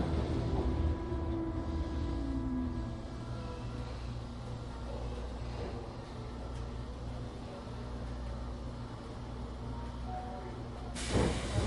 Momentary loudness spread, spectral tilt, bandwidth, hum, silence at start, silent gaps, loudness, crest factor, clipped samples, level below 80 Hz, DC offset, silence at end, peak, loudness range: 10 LU; -6.5 dB/octave; 11.5 kHz; 60 Hz at -45 dBFS; 0 s; none; -39 LUFS; 18 dB; under 0.1%; -40 dBFS; under 0.1%; 0 s; -18 dBFS; 6 LU